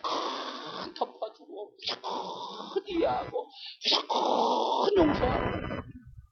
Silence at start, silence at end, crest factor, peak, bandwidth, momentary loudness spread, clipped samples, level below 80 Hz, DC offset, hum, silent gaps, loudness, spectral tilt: 0.05 s; 0.1 s; 20 dB; -12 dBFS; 6.8 kHz; 15 LU; under 0.1%; -50 dBFS; under 0.1%; none; none; -30 LUFS; -5 dB/octave